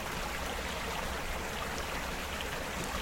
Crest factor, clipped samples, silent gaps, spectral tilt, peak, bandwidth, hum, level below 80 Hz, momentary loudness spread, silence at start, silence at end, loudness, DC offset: 16 dB; under 0.1%; none; -3 dB/octave; -22 dBFS; 16.5 kHz; none; -44 dBFS; 1 LU; 0 s; 0 s; -36 LUFS; under 0.1%